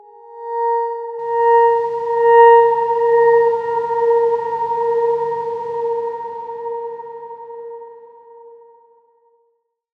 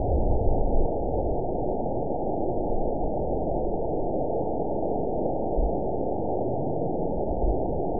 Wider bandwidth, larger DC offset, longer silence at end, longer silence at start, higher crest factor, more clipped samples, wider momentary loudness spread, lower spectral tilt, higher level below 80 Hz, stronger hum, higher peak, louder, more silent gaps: first, 4.8 kHz vs 1 kHz; second, under 0.1% vs 3%; first, 1.45 s vs 0 s; first, 0.25 s vs 0 s; about the same, 16 dB vs 16 dB; neither; first, 21 LU vs 2 LU; second, -5.5 dB/octave vs -18 dB/octave; second, -68 dBFS vs -32 dBFS; neither; first, -2 dBFS vs -10 dBFS; first, -16 LUFS vs -28 LUFS; neither